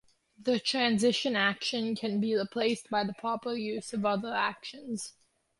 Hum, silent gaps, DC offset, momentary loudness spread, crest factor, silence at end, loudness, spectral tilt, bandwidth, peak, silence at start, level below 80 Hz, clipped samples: none; none; under 0.1%; 11 LU; 18 dB; 0.5 s; -30 LUFS; -4 dB/octave; 11.5 kHz; -12 dBFS; 0.4 s; -74 dBFS; under 0.1%